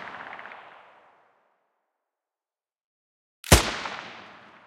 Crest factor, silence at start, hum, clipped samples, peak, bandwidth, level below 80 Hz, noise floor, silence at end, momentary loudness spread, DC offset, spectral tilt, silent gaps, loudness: 30 dB; 0 s; none; under 0.1%; 0 dBFS; 15.5 kHz; -38 dBFS; under -90 dBFS; 0.4 s; 25 LU; under 0.1%; -3.5 dB/octave; 2.84-3.43 s; -22 LUFS